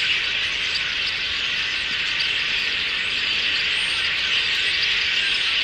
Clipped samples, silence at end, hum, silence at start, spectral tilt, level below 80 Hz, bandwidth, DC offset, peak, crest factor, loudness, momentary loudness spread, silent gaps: under 0.1%; 0 s; none; 0 s; 0 dB/octave; -50 dBFS; 15 kHz; under 0.1%; -10 dBFS; 14 dB; -20 LUFS; 3 LU; none